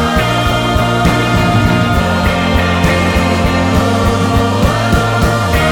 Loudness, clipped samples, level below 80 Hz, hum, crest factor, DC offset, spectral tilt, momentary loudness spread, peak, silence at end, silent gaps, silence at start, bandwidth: -12 LUFS; under 0.1%; -22 dBFS; none; 10 dB; under 0.1%; -5.5 dB/octave; 1 LU; 0 dBFS; 0 s; none; 0 s; 18 kHz